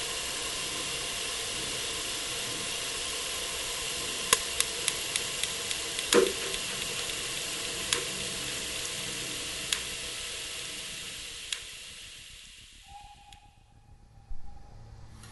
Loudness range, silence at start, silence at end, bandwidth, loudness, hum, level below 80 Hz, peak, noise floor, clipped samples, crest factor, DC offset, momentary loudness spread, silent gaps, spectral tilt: 14 LU; 0 s; 0 s; 12 kHz; -31 LUFS; none; -52 dBFS; -4 dBFS; -57 dBFS; under 0.1%; 30 dB; under 0.1%; 22 LU; none; -1 dB/octave